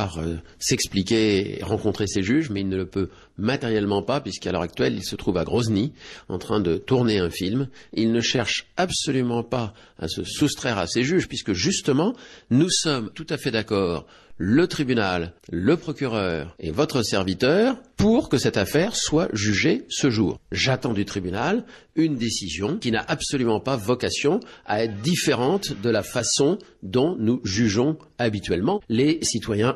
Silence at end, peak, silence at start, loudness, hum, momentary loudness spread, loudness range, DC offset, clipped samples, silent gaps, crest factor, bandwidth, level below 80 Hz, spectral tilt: 0 s; -8 dBFS; 0 s; -23 LUFS; none; 8 LU; 3 LU; under 0.1%; under 0.1%; none; 16 dB; 13 kHz; -48 dBFS; -4.5 dB/octave